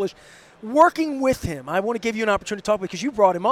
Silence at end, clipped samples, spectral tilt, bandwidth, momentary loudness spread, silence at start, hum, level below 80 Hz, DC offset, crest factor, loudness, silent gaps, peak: 0 s; under 0.1%; -5 dB/octave; 15.5 kHz; 10 LU; 0 s; none; -48 dBFS; under 0.1%; 18 dB; -22 LUFS; none; -2 dBFS